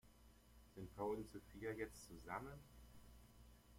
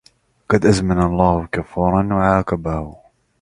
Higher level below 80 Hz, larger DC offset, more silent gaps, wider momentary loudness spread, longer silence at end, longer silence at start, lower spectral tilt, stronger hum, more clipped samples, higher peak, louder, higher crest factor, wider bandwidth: second, -68 dBFS vs -34 dBFS; neither; neither; first, 20 LU vs 9 LU; second, 0 s vs 0.5 s; second, 0.05 s vs 0.5 s; second, -5.5 dB/octave vs -7 dB/octave; neither; neither; second, -34 dBFS vs 0 dBFS; second, -51 LUFS vs -18 LUFS; about the same, 20 dB vs 18 dB; first, 16.5 kHz vs 11 kHz